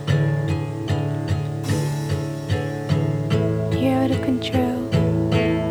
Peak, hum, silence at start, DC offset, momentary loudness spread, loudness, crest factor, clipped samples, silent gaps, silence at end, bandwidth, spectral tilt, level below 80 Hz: -6 dBFS; none; 0 s; under 0.1%; 5 LU; -22 LUFS; 16 dB; under 0.1%; none; 0 s; over 20 kHz; -7 dB/octave; -42 dBFS